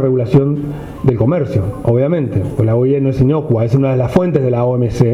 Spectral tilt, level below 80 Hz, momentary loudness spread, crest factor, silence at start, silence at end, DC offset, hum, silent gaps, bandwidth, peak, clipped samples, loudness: -9.5 dB/octave; -36 dBFS; 5 LU; 12 dB; 0 s; 0 s; under 0.1%; none; none; 10.5 kHz; -2 dBFS; under 0.1%; -14 LUFS